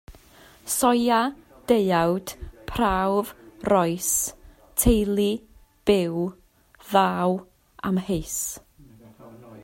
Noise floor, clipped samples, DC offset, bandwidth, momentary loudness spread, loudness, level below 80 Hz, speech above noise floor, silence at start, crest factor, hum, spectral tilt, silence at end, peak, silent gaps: -52 dBFS; under 0.1%; under 0.1%; 16.5 kHz; 13 LU; -24 LUFS; -40 dBFS; 29 dB; 0.1 s; 20 dB; none; -4.5 dB/octave; 0 s; -6 dBFS; none